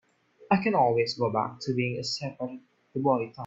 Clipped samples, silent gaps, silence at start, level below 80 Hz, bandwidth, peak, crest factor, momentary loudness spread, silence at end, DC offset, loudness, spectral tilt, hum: under 0.1%; none; 0.4 s; -68 dBFS; 8 kHz; -8 dBFS; 20 dB; 14 LU; 0 s; under 0.1%; -28 LUFS; -6 dB/octave; none